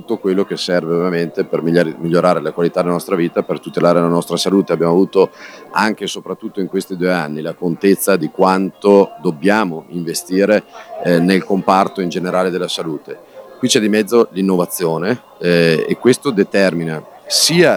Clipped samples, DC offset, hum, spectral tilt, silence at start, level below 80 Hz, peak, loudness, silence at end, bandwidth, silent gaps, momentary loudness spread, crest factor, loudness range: 0.1%; under 0.1%; none; -5 dB/octave; 0.1 s; -60 dBFS; 0 dBFS; -16 LUFS; 0 s; over 20 kHz; none; 9 LU; 16 dB; 2 LU